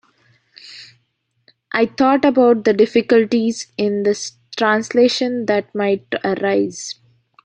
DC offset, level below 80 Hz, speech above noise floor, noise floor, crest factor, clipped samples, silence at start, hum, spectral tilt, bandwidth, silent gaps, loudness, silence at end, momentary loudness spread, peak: under 0.1%; -62 dBFS; 52 dB; -68 dBFS; 16 dB; under 0.1%; 0.65 s; none; -4.5 dB/octave; 9.6 kHz; none; -17 LUFS; 0.5 s; 16 LU; -2 dBFS